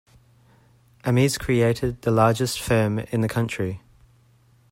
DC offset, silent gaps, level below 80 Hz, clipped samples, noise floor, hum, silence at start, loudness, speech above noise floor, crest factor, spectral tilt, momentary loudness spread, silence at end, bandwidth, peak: under 0.1%; none; -48 dBFS; under 0.1%; -58 dBFS; none; 1.05 s; -22 LUFS; 36 dB; 18 dB; -6 dB/octave; 9 LU; 0.95 s; 16 kHz; -4 dBFS